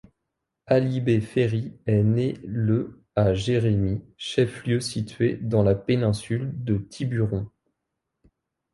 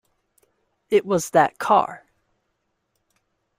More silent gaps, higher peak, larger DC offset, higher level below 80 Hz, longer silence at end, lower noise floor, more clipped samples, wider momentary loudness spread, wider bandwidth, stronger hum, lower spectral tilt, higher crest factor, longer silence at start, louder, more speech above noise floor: neither; about the same, -6 dBFS vs -4 dBFS; neither; first, -48 dBFS vs -66 dBFS; second, 1.25 s vs 1.6 s; first, -82 dBFS vs -74 dBFS; neither; first, 7 LU vs 4 LU; second, 11.5 kHz vs 16 kHz; neither; first, -7 dB/octave vs -4.5 dB/octave; about the same, 18 dB vs 20 dB; second, 0.7 s vs 0.9 s; second, -25 LUFS vs -20 LUFS; about the same, 58 dB vs 55 dB